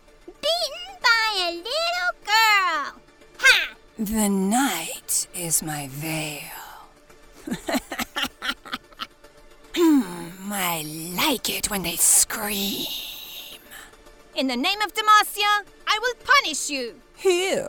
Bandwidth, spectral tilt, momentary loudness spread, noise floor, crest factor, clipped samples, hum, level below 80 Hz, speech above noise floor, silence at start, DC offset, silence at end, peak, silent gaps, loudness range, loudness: over 20 kHz; -2 dB/octave; 18 LU; -50 dBFS; 24 dB; under 0.1%; none; -52 dBFS; 27 dB; 0.25 s; under 0.1%; 0 s; -2 dBFS; none; 8 LU; -22 LUFS